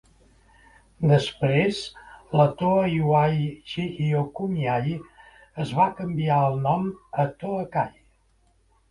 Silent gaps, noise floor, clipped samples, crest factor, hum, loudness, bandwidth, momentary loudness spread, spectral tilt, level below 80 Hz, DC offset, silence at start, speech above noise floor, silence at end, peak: none; -63 dBFS; under 0.1%; 20 dB; none; -24 LUFS; 11 kHz; 10 LU; -7.5 dB/octave; -54 dBFS; under 0.1%; 1 s; 40 dB; 1 s; -6 dBFS